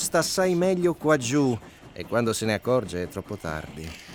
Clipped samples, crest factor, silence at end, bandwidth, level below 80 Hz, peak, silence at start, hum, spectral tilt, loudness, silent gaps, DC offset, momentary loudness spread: under 0.1%; 18 dB; 0 s; 19.5 kHz; -54 dBFS; -8 dBFS; 0 s; none; -4.5 dB/octave; -25 LUFS; none; under 0.1%; 13 LU